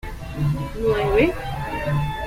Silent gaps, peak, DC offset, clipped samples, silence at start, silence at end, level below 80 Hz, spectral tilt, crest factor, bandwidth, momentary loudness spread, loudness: none; -6 dBFS; under 0.1%; under 0.1%; 0.05 s; 0 s; -34 dBFS; -7.5 dB/octave; 18 dB; 16 kHz; 9 LU; -22 LUFS